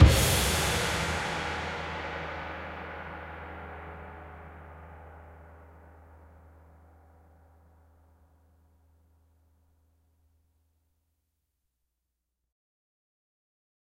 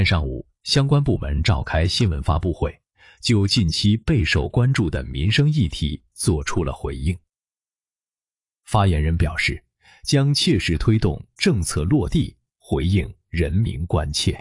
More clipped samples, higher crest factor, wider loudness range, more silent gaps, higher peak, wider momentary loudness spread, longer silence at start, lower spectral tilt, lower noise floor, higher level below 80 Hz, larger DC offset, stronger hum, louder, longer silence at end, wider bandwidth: neither; first, 28 dB vs 16 dB; first, 26 LU vs 5 LU; neither; about the same, -6 dBFS vs -4 dBFS; first, 25 LU vs 9 LU; about the same, 0 s vs 0 s; second, -4 dB/octave vs -5.5 dB/octave; second, -84 dBFS vs under -90 dBFS; second, -38 dBFS vs -32 dBFS; neither; neither; second, -30 LUFS vs -21 LUFS; first, 7.7 s vs 0 s; first, 16 kHz vs 11.5 kHz